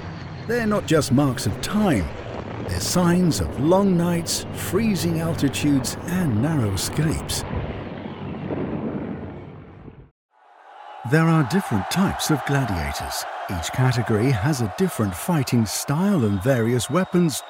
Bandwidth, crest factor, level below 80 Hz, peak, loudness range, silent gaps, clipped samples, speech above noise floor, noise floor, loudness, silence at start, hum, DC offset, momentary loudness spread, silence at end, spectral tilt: 19.5 kHz; 18 dB; -44 dBFS; -4 dBFS; 7 LU; 10.11-10.29 s; under 0.1%; 27 dB; -48 dBFS; -22 LUFS; 0 s; none; under 0.1%; 13 LU; 0 s; -5.5 dB/octave